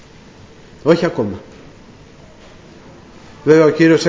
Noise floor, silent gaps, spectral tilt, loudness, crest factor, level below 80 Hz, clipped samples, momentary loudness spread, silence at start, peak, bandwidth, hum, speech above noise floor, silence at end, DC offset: -41 dBFS; none; -6.5 dB/octave; -14 LUFS; 18 dB; -50 dBFS; under 0.1%; 13 LU; 0.85 s; 0 dBFS; 8 kHz; none; 29 dB; 0 s; under 0.1%